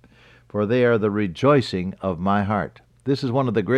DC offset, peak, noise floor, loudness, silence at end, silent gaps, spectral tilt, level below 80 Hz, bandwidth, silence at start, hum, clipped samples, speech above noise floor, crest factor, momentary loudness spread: under 0.1%; -6 dBFS; -52 dBFS; -22 LUFS; 0 s; none; -7.5 dB/octave; -54 dBFS; 10.5 kHz; 0.55 s; none; under 0.1%; 31 dB; 16 dB; 9 LU